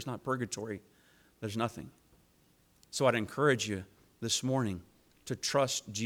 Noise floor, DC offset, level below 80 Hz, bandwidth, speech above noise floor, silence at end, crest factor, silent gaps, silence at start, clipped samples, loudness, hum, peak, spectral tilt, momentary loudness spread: -67 dBFS; under 0.1%; -68 dBFS; 19.5 kHz; 34 dB; 0 s; 22 dB; none; 0 s; under 0.1%; -33 LUFS; none; -14 dBFS; -4 dB/octave; 16 LU